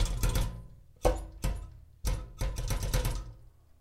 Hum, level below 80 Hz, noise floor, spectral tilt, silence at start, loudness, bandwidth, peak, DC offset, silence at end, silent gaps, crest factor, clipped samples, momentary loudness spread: none; -34 dBFS; -54 dBFS; -5 dB/octave; 0 s; -35 LUFS; 16 kHz; -12 dBFS; under 0.1%; 0.3 s; none; 22 dB; under 0.1%; 15 LU